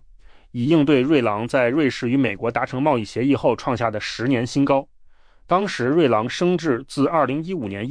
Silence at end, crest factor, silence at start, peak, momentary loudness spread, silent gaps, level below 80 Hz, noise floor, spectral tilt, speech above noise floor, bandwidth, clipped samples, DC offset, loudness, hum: 0 s; 16 dB; 0.3 s; -6 dBFS; 6 LU; none; -52 dBFS; -48 dBFS; -6.5 dB/octave; 29 dB; 10.5 kHz; under 0.1%; under 0.1%; -20 LUFS; none